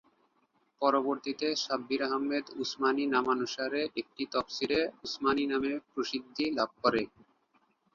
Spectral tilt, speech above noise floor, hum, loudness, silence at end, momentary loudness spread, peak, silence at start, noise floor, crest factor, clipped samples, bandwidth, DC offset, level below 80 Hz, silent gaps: -3.5 dB/octave; 41 dB; none; -31 LUFS; 0.9 s; 6 LU; -12 dBFS; 0.8 s; -73 dBFS; 20 dB; under 0.1%; 7.4 kHz; under 0.1%; -70 dBFS; none